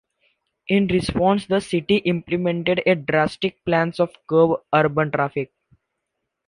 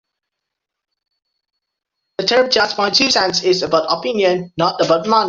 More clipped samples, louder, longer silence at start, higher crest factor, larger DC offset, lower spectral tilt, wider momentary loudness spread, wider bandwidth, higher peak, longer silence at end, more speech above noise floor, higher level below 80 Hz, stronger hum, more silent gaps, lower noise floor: neither; second, -21 LUFS vs -15 LUFS; second, 0.7 s vs 2.2 s; about the same, 18 dB vs 16 dB; neither; first, -6.5 dB/octave vs -3 dB/octave; about the same, 6 LU vs 6 LU; first, 11 kHz vs 7.8 kHz; second, -4 dBFS vs 0 dBFS; first, 1.05 s vs 0 s; second, 59 dB vs 64 dB; first, -50 dBFS vs -58 dBFS; neither; neither; about the same, -79 dBFS vs -80 dBFS